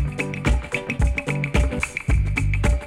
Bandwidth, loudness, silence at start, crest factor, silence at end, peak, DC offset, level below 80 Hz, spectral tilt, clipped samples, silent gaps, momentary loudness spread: 12 kHz; -23 LUFS; 0 s; 16 dB; 0 s; -4 dBFS; under 0.1%; -24 dBFS; -6 dB/octave; under 0.1%; none; 3 LU